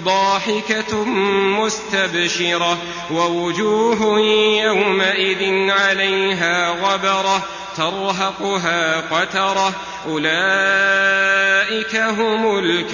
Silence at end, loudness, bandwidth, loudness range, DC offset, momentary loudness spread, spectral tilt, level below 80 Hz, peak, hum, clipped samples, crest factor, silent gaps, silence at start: 0 s; -17 LUFS; 7.4 kHz; 3 LU; under 0.1%; 6 LU; -3 dB/octave; -56 dBFS; -2 dBFS; none; under 0.1%; 14 dB; none; 0 s